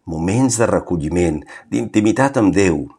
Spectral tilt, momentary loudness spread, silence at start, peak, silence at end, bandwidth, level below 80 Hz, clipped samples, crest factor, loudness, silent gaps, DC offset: -6 dB/octave; 8 LU; 0.05 s; -2 dBFS; 0.1 s; 13.5 kHz; -40 dBFS; under 0.1%; 16 dB; -17 LUFS; none; under 0.1%